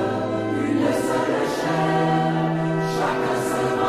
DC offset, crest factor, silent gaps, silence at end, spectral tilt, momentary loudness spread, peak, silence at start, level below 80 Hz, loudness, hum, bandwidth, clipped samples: under 0.1%; 12 dB; none; 0 s; -6 dB/octave; 3 LU; -10 dBFS; 0 s; -54 dBFS; -22 LUFS; none; 15 kHz; under 0.1%